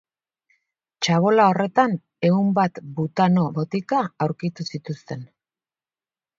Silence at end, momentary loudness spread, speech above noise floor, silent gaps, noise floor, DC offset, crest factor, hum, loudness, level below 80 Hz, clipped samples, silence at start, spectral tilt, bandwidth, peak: 1.15 s; 15 LU; over 69 dB; none; under -90 dBFS; under 0.1%; 20 dB; none; -21 LUFS; -66 dBFS; under 0.1%; 1 s; -6.5 dB/octave; 7.6 kHz; -2 dBFS